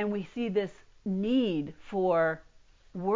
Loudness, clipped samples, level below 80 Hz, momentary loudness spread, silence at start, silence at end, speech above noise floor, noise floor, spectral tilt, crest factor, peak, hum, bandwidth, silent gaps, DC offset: -30 LUFS; under 0.1%; -62 dBFS; 13 LU; 0 s; 0 s; 20 dB; -50 dBFS; -8 dB/octave; 14 dB; -16 dBFS; none; 7.6 kHz; none; under 0.1%